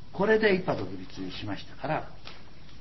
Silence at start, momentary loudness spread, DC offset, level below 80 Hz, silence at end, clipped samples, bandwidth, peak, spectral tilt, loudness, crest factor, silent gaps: 0.05 s; 23 LU; 1%; -54 dBFS; 0 s; under 0.1%; 6 kHz; -10 dBFS; -7 dB/octave; -29 LUFS; 20 dB; none